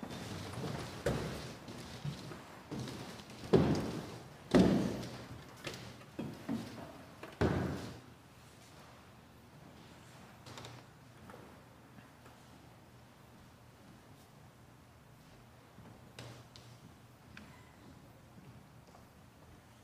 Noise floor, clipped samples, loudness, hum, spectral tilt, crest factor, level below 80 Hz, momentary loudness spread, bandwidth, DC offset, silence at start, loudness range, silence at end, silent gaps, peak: -59 dBFS; under 0.1%; -38 LUFS; none; -6.5 dB/octave; 28 dB; -60 dBFS; 24 LU; 15.5 kHz; under 0.1%; 0 s; 23 LU; 0 s; none; -12 dBFS